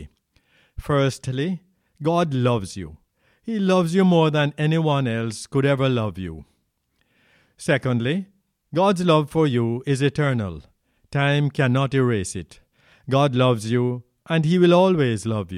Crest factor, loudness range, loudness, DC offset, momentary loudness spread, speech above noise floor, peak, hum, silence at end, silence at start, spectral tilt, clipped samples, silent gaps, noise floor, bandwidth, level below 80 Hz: 16 dB; 4 LU; -21 LUFS; under 0.1%; 16 LU; 49 dB; -6 dBFS; none; 0 s; 0 s; -6.5 dB/octave; under 0.1%; none; -70 dBFS; 12.5 kHz; -50 dBFS